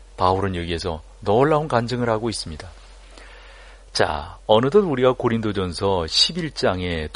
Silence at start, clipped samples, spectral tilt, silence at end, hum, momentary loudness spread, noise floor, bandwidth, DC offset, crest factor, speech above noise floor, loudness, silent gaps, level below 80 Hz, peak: 0 s; under 0.1%; -5 dB/octave; 0 s; none; 12 LU; -43 dBFS; 11 kHz; under 0.1%; 20 dB; 23 dB; -21 LUFS; none; -42 dBFS; -2 dBFS